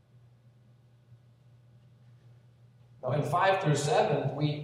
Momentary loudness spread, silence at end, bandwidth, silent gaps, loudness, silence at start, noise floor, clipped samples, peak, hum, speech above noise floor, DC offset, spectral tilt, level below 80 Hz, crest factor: 7 LU; 0 s; 13.5 kHz; none; -28 LUFS; 3.05 s; -60 dBFS; under 0.1%; -14 dBFS; none; 33 dB; under 0.1%; -5.5 dB/octave; -70 dBFS; 18 dB